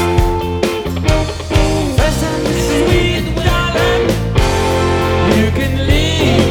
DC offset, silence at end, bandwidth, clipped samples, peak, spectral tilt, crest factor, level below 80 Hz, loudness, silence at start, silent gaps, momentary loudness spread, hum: under 0.1%; 0 s; over 20 kHz; under 0.1%; 0 dBFS; -5.5 dB/octave; 14 dB; -20 dBFS; -14 LUFS; 0 s; none; 4 LU; none